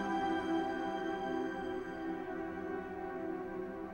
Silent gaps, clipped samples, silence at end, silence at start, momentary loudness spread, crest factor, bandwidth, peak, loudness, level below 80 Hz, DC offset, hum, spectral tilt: none; under 0.1%; 0 s; 0 s; 7 LU; 14 dB; 16 kHz; -24 dBFS; -39 LUFS; -64 dBFS; under 0.1%; none; -6 dB/octave